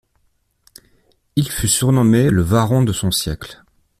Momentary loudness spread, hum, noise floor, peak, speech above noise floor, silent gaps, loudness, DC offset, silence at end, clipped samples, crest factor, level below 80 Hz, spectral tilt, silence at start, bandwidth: 12 LU; none; -64 dBFS; -2 dBFS; 48 dB; none; -16 LUFS; under 0.1%; 0.45 s; under 0.1%; 16 dB; -40 dBFS; -5 dB/octave; 1.35 s; 16 kHz